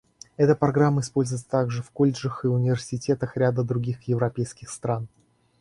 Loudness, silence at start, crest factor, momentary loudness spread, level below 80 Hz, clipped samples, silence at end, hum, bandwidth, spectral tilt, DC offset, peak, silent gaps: -25 LUFS; 0.4 s; 18 dB; 10 LU; -56 dBFS; under 0.1%; 0.55 s; none; 11.5 kHz; -7 dB/octave; under 0.1%; -6 dBFS; none